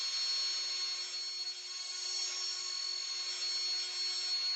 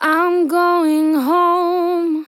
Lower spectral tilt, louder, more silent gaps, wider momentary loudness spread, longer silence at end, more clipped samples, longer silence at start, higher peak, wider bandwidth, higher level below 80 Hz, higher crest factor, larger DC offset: second, 4 dB/octave vs -3 dB/octave; second, -34 LUFS vs -15 LUFS; neither; about the same, 5 LU vs 3 LU; about the same, 0 s vs 0.05 s; neither; about the same, 0 s vs 0 s; second, -24 dBFS vs -4 dBFS; first, over 20 kHz vs 16 kHz; about the same, under -90 dBFS vs under -90 dBFS; about the same, 12 dB vs 12 dB; neither